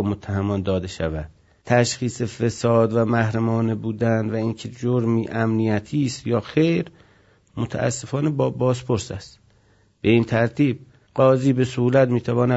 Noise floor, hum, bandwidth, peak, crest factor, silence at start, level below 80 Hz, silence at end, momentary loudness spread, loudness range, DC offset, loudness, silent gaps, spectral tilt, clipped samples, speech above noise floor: -58 dBFS; none; 8 kHz; -2 dBFS; 18 dB; 0 s; -52 dBFS; 0 s; 9 LU; 3 LU; under 0.1%; -22 LUFS; none; -6.5 dB/octave; under 0.1%; 38 dB